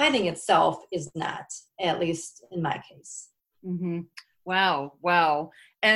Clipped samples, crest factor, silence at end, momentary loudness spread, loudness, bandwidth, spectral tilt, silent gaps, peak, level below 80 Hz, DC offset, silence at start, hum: under 0.1%; 20 dB; 0 s; 19 LU; -26 LUFS; 12.5 kHz; -4 dB/octave; none; -6 dBFS; -66 dBFS; under 0.1%; 0 s; none